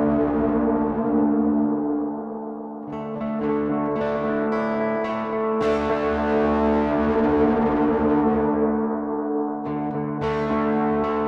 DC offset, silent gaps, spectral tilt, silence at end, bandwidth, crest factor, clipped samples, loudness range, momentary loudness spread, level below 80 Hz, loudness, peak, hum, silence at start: under 0.1%; none; -8.5 dB/octave; 0 s; 6.6 kHz; 12 dB; under 0.1%; 5 LU; 7 LU; -44 dBFS; -22 LUFS; -10 dBFS; none; 0 s